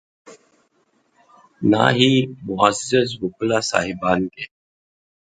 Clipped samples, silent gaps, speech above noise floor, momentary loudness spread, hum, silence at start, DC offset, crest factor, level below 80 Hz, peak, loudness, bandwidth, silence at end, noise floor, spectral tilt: under 0.1%; none; 45 dB; 11 LU; none; 0.25 s; under 0.1%; 20 dB; -54 dBFS; 0 dBFS; -19 LUFS; 9.4 kHz; 0.75 s; -64 dBFS; -4.5 dB/octave